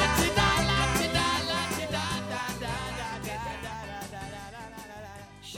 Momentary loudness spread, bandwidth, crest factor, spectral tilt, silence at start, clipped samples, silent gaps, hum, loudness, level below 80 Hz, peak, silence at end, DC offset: 19 LU; 18 kHz; 20 dB; -3.5 dB/octave; 0 s; under 0.1%; none; none; -28 LUFS; -42 dBFS; -10 dBFS; 0 s; under 0.1%